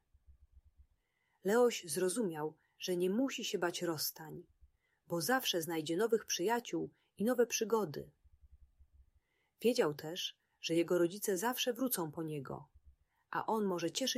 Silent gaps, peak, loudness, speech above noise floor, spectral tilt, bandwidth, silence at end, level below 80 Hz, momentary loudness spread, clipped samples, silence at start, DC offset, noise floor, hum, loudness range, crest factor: none; -18 dBFS; -36 LUFS; 44 dB; -3.5 dB/octave; 15.5 kHz; 0 s; -72 dBFS; 12 LU; under 0.1%; 0.3 s; under 0.1%; -80 dBFS; none; 3 LU; 18 dB